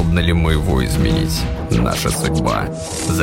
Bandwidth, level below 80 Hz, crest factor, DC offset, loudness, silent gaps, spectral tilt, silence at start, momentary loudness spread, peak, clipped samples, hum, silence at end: 16.5 kHz; -24 dBFS; 16 dB; under 0.1%; -18 LUFS; none; -5.5 dB/octave; 0 s; 5 LU; -2 dBFS; under 0.1%; none; 0 s